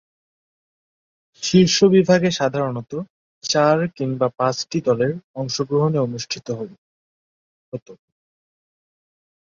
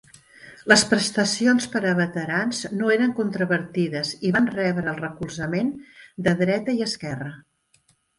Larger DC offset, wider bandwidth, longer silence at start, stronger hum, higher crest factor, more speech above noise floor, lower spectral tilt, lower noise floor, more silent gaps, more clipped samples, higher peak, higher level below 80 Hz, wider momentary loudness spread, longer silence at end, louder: neither; second, 7.6 kHz vs 11.5 kHz; first, 1.4 s vs 0.45 s; neither; about the same, 20 dB vs 22 dB; first, over 71 dB vs 41 dB; about the same, -5 dB/octave vs -4.5 dB/octave; first, under -90 dBFS vs -64 dBFS; first, 3.10-3.41 s, 5.24-5.34 s, 6.78-7.72 s, 7.82-7.86 s vs none; neither; about the same, -2 dBFS vs 0 dBFS; about the same, -60 dBFS vs -60 dBFS; first, 18 LU vs 12 LU; first, 1.6 s vs 0.8 s; first, -19 LUFS vs -22 LUFS